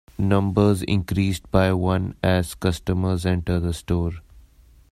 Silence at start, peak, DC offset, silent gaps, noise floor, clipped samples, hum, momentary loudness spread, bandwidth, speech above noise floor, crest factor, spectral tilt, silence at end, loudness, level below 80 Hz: 0.2 s; -4 dBFS; under 0.1%; none; -52 dBFS; under 0.1%; none; 5 LU; 14 kHz; 31 dB; 18 dB; -7 dB/octave; 0.5 s; -22 LUFS; -40 dBFS